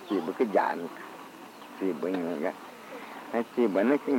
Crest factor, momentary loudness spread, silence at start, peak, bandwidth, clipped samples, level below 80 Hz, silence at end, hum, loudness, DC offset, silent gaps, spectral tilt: 18 dB; 18 LU; 0 s; -12 dBFS; 17 kHz; under 0.1%; -84 dBFS; 0 s; none; -29 LUFS; under 0.1%; none; -6 dB/octave